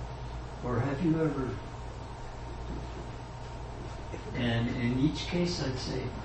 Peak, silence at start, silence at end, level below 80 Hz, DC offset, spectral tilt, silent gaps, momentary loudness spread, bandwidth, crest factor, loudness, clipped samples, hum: -16 dBFS; 0 s; 0 s; -44 dBFS; under 0.1%; -6.5 dB/octave; none; 13 LU; 8.6 kHz; 16 dB; -34 LUFS; under 0.1%; none